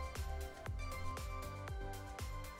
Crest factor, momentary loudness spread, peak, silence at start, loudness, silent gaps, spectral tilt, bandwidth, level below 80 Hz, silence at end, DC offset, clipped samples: 14 dB; 2 LU; -30 dBFS; 0 s; -46 LUFS; none; -5 dB/octave; 16.5 kHz; -46 dBFS; 0 s; under 0.1%; under 0.1%